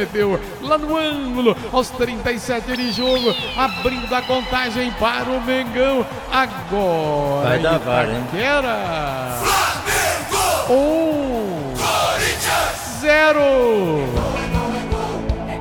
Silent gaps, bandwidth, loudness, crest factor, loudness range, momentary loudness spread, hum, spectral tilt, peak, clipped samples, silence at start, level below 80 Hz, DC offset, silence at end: none; 17.5 kHz; -19 LUFS; 16 dB; 3 LU; 6 LU; none; -4 dB/octave; -2 dBFS; under 0.1%; 0 s; -36 dBFS; 0.1%; 0 s